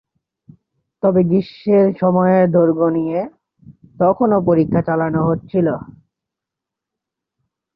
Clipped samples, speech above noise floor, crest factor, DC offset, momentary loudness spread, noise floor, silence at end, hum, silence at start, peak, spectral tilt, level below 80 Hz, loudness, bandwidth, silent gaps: under 0.1%; 69 dB; 14 dB; under 0.1%; 7 LU; -84 dBFS; 1.95 s; none; 1.05 s; -2 dBFS; -12 dB/octave; -52 dBFS; -16 LUFS; 5.4 kHz; none